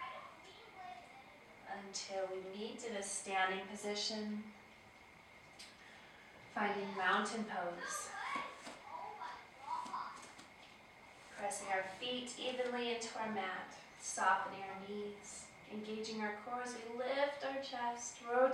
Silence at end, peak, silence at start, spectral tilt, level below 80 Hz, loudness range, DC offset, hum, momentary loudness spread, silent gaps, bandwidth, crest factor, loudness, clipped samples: 0 s; -20 dBFS; 0 s; -2.5 dB/octave; -80 dBFS; 6 LU; under 0.1%; none; 20 LU; none; 15.5 kHz; 22 dB; -41 LUFS; under 0.1%